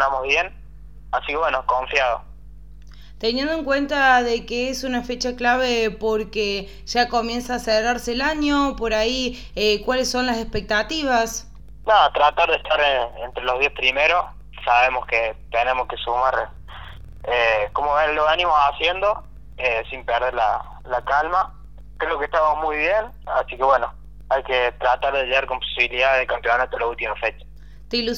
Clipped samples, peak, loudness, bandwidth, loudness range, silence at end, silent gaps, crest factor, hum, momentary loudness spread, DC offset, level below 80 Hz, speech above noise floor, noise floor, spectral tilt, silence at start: under 0.1%; -2 dBFS; -21 LUFS; 17.5 kHz; 3 LU; 0 s; none; 18 dB; none; 9 LU; 0.8%; -40 dBFS; 21 dB; -42 dBFS; -3 dB/octave; 0 s